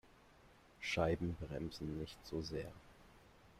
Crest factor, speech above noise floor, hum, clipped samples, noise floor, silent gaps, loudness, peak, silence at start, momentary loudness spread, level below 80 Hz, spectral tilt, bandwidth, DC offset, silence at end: 22 dB; 24 dB; none; under 0.1%; -66 dBFS; none; -43 LUFS; -24 dBFS; 0.05 s; 21 LU; -60 dBFS; -6 dB/octave; 15 kHz; under 0.1%; 0 s